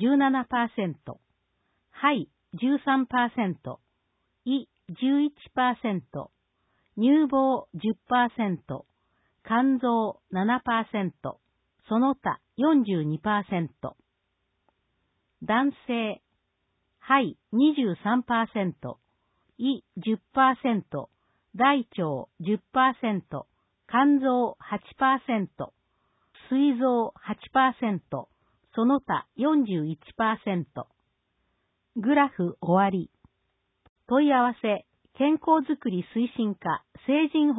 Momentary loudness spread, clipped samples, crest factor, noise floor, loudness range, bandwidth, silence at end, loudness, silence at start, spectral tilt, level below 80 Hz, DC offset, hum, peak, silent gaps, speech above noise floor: 16 LU; under 0.1%; 20 dB; -77 dBFS; 3 LU; 4 kHz; 0 s; -26 LUFS; 0 s; -10.5 dB/octave; -66 dBFS; under 0.1%; none; -8 dBFS; 33.89-33.96 s; 52 dB